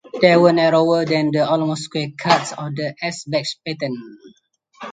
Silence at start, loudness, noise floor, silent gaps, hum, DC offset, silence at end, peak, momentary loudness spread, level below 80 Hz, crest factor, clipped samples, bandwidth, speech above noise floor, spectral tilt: 0.05 s; -18 LUFS; -56 dBFS; none; none; under 0.1%; 0 s; 0 dBFS; 13 LU; -64 dBFS; 18 dB; under 0.1%; 9.4 kHz; 38 dB; -5.5 dB/octave